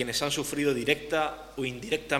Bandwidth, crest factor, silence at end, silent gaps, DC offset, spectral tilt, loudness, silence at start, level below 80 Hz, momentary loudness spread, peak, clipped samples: 17 kHz; 22 dB; 0 s; none; under 0.1%; -3.5 dB/octave; -29 LUFS; 0 s; -54 dBFS; 7 LU; -8 dBFS; under 0.1%